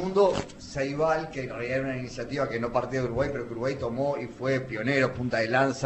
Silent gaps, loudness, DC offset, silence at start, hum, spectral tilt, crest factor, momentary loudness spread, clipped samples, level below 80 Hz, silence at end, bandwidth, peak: none; -28 LUFS; under 0.1%; 0 s; none; -6 dB/octave; 18 dB; 9 LU; under 0.1%; -52 dBFS; 0 s; 8.4 kHz; -10 dBFS